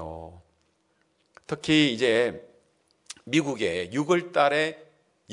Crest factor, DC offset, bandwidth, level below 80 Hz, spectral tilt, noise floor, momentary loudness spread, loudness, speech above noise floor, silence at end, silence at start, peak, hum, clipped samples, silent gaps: 20 dB; under 0.1%; 11 kHz; -64 dBFS; -4.5 dB/octave; -70 dBFS; 22 LU; -25 LUFS; 46 dB; 0 s; 0 s; -6 dBFS; none; under 0.1%; none